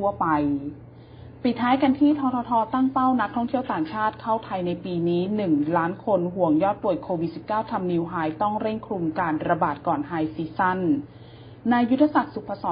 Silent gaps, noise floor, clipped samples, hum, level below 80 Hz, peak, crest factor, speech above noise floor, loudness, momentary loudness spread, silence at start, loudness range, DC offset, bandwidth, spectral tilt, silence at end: none; -44 dBFS; under 0.1%; none; -54 dBFS; -6 dBFS; 18 dB; 20 dB; -24 LUFS; 8 LU; 0 s; 3 LU; under 0.1%; 5.2 kHz; -11.5 dB/octave; 0 s